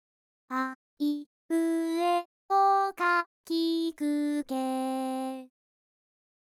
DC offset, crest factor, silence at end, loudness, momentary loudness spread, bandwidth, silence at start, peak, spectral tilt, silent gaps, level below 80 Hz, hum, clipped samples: under 0.1%; 14 dB; 1 s; -29 LUFS; 10 LU; 15 kHz; 0.5 s; -16 dBFS; -2.5 dB/octave; 0.75-0.97 s, 1.26-1.49 s, 2.25-2.49 s, 3.26-3.44 s; -82 dBFS; none; under 0.1%